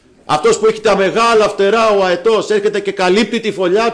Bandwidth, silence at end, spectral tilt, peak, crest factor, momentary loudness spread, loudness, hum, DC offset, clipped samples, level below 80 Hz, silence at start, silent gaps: 10.5 kHz; 0 s; -4 dB/octave; -4 dBFS; 8 dB; 5 LU; -13 LUFS; none; under 0.1%; under 0.1%; -48 dBFS; 0.3 s; none